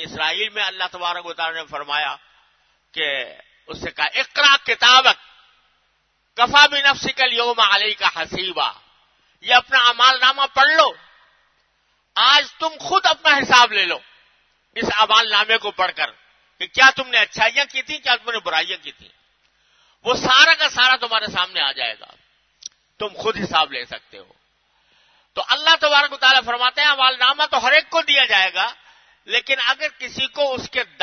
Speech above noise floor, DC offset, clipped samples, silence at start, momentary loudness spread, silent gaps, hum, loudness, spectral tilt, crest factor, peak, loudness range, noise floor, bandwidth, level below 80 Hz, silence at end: 48 dB; under 0.1%; under 0.1%; 0 s; 14 LU; none; none; -16 LUFS; -1 dB/octave; 20 dB; 0 dBFS; 8 LU; -66 dBFS; 12 kHz; -58 dBFS; 0.2 s